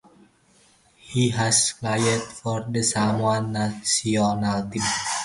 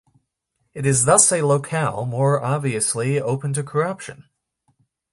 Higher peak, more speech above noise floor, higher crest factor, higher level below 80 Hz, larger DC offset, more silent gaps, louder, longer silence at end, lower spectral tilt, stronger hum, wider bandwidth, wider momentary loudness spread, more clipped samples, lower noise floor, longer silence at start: second, -8 dBFS vs 0 dBFS; second, 35 dB vs 53 dB; about the same, 18 dB vs 22 dB; about the same, -54 dBFS vs -58 dBFS; neither; neither; second, -23 LUFS vs -19 LUFS; second, 0 s vs 0.9 s; about the same, -3.5 dB/octave vs -4.5 dB/octave; neither; about the same, 11.5 kHz vs 11.5 kHz; second, 8 LU vs 12 LU; neither; second, -58 dBFS vs -73 dBFS; first, 1.05 s vs 0.75 s